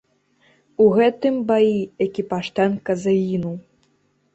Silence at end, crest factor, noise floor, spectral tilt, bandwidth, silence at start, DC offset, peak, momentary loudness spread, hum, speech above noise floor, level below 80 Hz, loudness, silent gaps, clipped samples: 0.75 s; 16 dB; -64 dBFS; -7 dB/octave; 8.2 kHz; 0.8 s; under 0.1%; -4 dBFS; 10 LU; none; 45 dB; -60 dBFS; -20 LUFS; none; under 0.1%